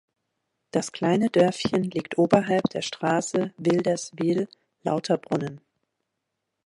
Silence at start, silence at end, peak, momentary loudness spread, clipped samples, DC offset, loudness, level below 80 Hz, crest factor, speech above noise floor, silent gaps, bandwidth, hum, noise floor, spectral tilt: 0.75 s; 1.1 s; -4 dBFS; 8 LU; under 0.1%; under 0.1%; -25 LUFS; -64 dBFS; 22 dB; 57 dB; none; 11.5 kHz; none; -81 dBFS; -5.5 dB/octave